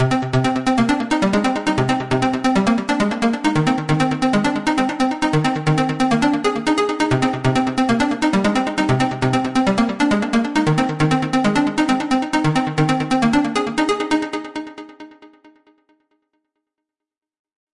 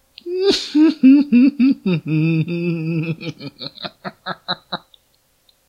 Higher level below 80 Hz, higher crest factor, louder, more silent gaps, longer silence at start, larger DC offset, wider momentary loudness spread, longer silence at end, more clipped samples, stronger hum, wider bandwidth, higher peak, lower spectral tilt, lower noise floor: first, -44 dBFS vs -60 dBFS; about the same, 14 dB vs 16 dB; about the same, -18 LUFS vs -17 LUFS; neither; second, 0 s vs 0.25 s; first, 0.4% vs under 0.1%; second, 2 LU vs 18 LU; first, 2.3 s vs 0.9 s; neither; neither; first, 11.5 kHz vs 9.8 kHz; about the same, -4 dBFS vs -2 dBFS; about the same, -6 dB/octave vs -6.5 dB/octave; first, -88 dBFS vs -61 dBFS